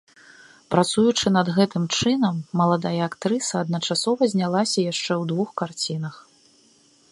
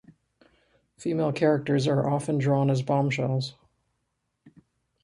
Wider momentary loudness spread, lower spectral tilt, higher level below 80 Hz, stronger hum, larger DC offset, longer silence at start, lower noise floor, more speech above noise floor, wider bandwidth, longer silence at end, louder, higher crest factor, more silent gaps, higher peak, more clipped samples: about the same, 7 LU vs 7 LU; second, -5 dB/octave vs -7 dB/octave; about the same, -60 dBFS vs -64 dBFS; neither; neither; second, 0.7 s vs 1 s; second, -57 dBFS vs -78 dBFS; second, 35 dB vs 53 dB; about the same, 11.5 kHz vs 11 kHz; first, 0.9 s vs 0.55 s; first, -22 LUFS vs -26 LUFS; about the same, 22 dB vs 18 dB; neither; first, -2 dBFS vs -10 dBFS; neither